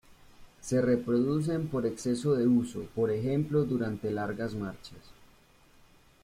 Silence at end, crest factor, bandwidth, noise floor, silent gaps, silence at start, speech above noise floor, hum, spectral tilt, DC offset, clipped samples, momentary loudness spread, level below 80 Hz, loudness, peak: 1 s; 16 dB; 14.5 kHz; -60 dBFS; none; 0.1 s; 31 dB; none; -7 dB/octave; under 0.1%; under 0.1%; 10 LU; -60 dBFS; -30 LUFS; -14 dBFS